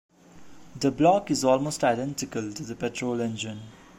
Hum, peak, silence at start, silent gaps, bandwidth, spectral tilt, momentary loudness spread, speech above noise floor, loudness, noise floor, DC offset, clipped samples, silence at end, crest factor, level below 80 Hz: none; -8 dBFS; 0.35 s; none; 16 kHz; -5 dB/octave; 13 LU; 23 dB; -26 LUFS; -49 dBFS; under 0.1%; under 0.1%; 0.25 s; 18 dB; -58 dBFS